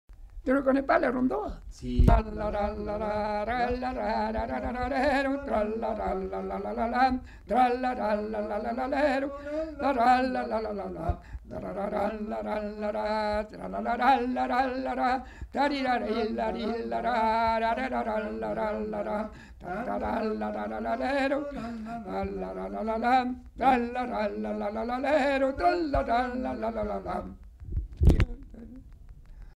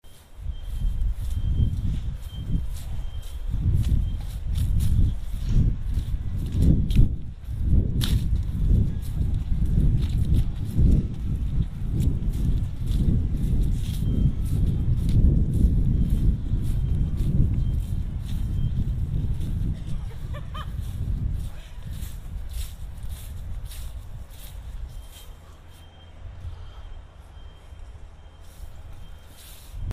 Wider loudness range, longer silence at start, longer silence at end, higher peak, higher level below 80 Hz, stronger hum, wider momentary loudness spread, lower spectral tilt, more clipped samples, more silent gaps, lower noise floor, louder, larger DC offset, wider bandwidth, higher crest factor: second, 4 LU vs 18 LU; about the same, 0.1 s vs 0.05 s; about the same, 0.05 s vs 0 s; about the same, -6 dBFS vs -4 dBFS; second, -38 dBFS vs -26 dBFS; neither; second, 11 LU vs 21 LU; about the same, -7.5 dB/octave vs -7.5 dB/octave; neither; neither; about the same, -48 dBFS vs -45 dBFS; about the same, -29 LUFS vs -27 LUFS; neither; second, 13 kHz vs 15 kHz; about the same, 22 dB vs 20 dB